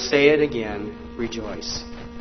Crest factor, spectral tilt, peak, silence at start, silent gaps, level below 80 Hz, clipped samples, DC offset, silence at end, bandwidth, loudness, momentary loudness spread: 20 dB; -4 dB/octave; -2 dBFS; 0 s; none; -44 dBFS; under 0.1%; under 0.1%; 0 s; 6.4 kHz; -23 LUFS; 16 LU